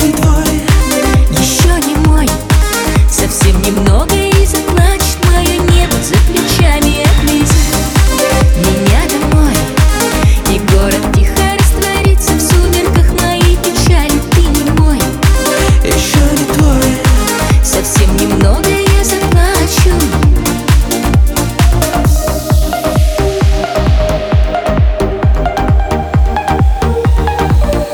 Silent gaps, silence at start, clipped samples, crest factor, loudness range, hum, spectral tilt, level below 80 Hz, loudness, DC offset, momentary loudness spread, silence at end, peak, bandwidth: none; 0 s; under 0.1%; 8 dB; 2 LU; none; -5 dB/octave; -12 dBFS; -10 LUFS; under 0.1%; 3 LU; 0 s; 0 dBFS; over 20 kHz